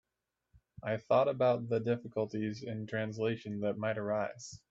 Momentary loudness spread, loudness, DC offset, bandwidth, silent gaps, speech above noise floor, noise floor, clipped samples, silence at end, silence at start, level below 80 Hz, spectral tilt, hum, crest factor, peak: 9 LU; -34 LUFS; under 0.1%; 7.8 kHz; none; 54 dB; -88 dBFS; under 0.1%; 0.15 s; 0.85 s; -72 dBFS; -6.5 dB/octave; none; 18 dB; -16 dBFS